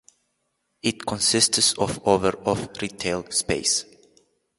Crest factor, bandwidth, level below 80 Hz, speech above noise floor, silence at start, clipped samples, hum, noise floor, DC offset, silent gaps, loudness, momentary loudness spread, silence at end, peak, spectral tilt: 24 dB; 12 kHz; -52 dBFS; 51 dB; 0.85 s; under 0.1%; none; -74 dBFS; under 0.1%; none; -22 LUFS; 10 LU; 0.75 s; -2 dBFS; -2.5 dB/octave